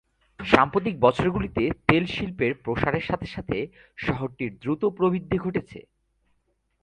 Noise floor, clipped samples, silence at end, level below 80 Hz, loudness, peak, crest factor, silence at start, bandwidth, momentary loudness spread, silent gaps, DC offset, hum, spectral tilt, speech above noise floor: -71 dBFS; under 0.1%; 1 s; -46 dBFS; -25 LUFS; 0 dBFS; 26 dB; 0.4 s; 10 kHz; 11 LU; none; under 0.1%; none; -7.5 dB/octave; 46 dB